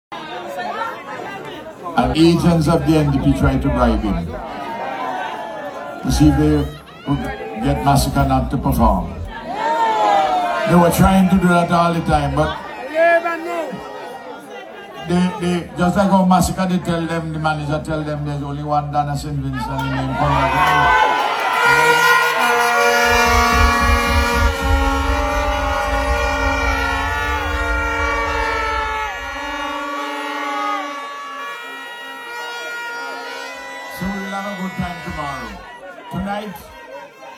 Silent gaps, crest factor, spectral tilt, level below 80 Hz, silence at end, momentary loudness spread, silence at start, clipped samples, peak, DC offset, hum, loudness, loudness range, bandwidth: none; 18 dB; -5.5 dB/octave; -28 dBFS; 0 s; 16 LU; 0.1 s; under 0.1%; 0 dBFS; under 0.1%; none; -17 LUFS; 12 LU; 18 kHz